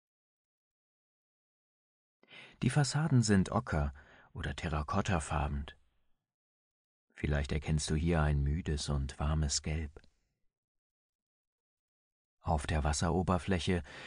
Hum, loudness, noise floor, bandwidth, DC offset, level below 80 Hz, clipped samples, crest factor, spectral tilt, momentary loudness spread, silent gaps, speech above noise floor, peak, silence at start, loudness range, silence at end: none; -33 LUFS; -73 dBFS; 10.5 kHz; under 0.1%; -42 dBFS; under 0.1%; 20 dB; -5.5 dB/octave; 12 LU; 6.34-7.08 s, 10.57-12.37 s; 41 dB; -16 dBFS; 2.3 s; 6 LU; 0 s